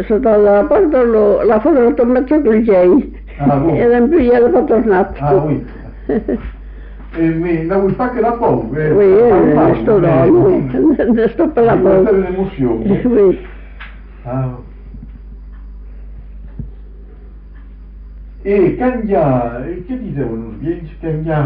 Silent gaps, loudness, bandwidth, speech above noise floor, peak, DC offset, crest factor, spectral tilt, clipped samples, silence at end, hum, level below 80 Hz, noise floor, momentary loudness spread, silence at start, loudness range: none; -13 LUFS; 4.9 kHz; 22 dB; -2 dBFS; under 0.1%; 10 dB; -8.5 dB/octave; under 0.1%; 0 s; none; -32 dBFS; -34 dBFS; 14 LU; 0 s; 10 LU